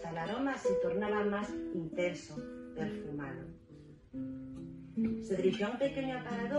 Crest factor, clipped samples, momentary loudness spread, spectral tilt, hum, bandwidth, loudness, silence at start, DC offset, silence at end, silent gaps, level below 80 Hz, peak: 18 dB; under 0.1%; 14 LU; -6.5 dB/octave; none; 11 kHz; -36 LUFS; 0 s; under 0.1%; 0 s; none; -62 dBFS; -18 dBFS